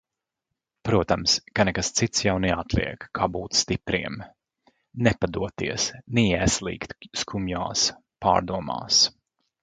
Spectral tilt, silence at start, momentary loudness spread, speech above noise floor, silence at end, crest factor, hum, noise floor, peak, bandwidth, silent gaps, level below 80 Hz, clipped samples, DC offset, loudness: -3.5 dB/octave; 0.85 s; 10 LU; 60 dB; 0.5 s; 24 dB; none; -84 dBFS; -2 dBFS; 11 kHz; none; -44 dBFS; under 0.1%; under 0.1%; -24 LUFS